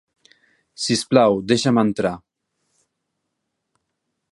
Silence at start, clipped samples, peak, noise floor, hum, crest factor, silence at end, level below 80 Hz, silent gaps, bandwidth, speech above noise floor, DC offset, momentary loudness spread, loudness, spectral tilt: 0.8 s; under 0.1%; -2 dBFS; -77 dBFS; none; 22 dB; 2.15 s; -58 dBFS; none; 11.5 kHz; 59 dB; under 0.1%; 10 LU; -19 LUFS; -5 dB/octave